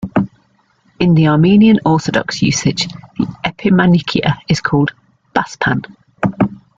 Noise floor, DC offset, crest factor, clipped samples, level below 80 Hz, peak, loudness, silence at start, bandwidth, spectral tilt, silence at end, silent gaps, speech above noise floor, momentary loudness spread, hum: -56 dBFS; under 0.1%; 14 dB; under 0.1%; -44 dBFS; 0 dBFS; -14 LUFS; 0 s; 7.8 kHz; -6 dB/octave; 0.25 s; none; 44 dB; 11 LU; none